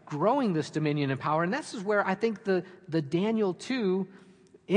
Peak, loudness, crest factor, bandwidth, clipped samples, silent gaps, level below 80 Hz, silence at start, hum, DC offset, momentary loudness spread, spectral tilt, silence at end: -10 dBFS; -29 LUFS; 20 dB; 10.5 kHz; under 0.1%; none; -76 dBFS; 0.05 s; none; under 0.1%; 6 LU; -6.5 dB/octave; 0 s